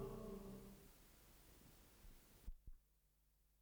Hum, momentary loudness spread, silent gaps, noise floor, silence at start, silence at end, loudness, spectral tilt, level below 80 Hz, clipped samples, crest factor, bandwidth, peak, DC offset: none; 13 LU; none; -79 dBFS; 0 s; 0 s; -61 LUFS; -6 dB/octave; -64 dBFS; under 0.1%; 18 dB; over 20 kHz; -40 dBFS; under 0.1%